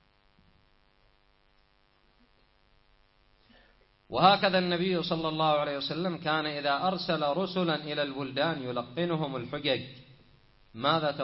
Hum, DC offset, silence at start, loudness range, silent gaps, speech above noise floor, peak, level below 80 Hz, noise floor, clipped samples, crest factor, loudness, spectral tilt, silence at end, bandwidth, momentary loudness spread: none; under 0.1%; 4.1 s; 5 LU; none; 38 dB; -8 dBFS; -64 dBFS; -67 dBFS; under 0.1%; 22 dB; -29 LUFS; -9 dB/octave; 0 s; 5.8 kHz; 8 LU